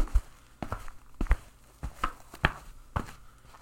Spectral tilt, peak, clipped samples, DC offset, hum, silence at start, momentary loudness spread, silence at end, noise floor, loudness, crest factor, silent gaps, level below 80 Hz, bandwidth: -5.5 dB/octave; -4 dBFS; under 0.1%; under 0.1%; none; 0 s; 23 LU; 0.05 s; -51 dBFS; -35 LUFS; 28 dB; none; -34 dBFS; 16.5 kHz